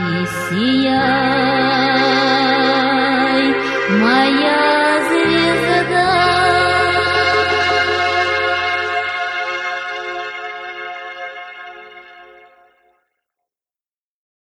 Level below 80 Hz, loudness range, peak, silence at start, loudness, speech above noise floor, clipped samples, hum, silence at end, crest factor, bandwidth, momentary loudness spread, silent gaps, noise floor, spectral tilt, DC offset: -48 dBFS; 15 LU; -2 dBFS; 0 s; -15 LUFS; over 75 dB; under 0.1%; none; 2.2 s; 14 dB; 13.5 kHz; 14 LU; none; under -90 dBFS; -4.5 dB/octave; under 0.1%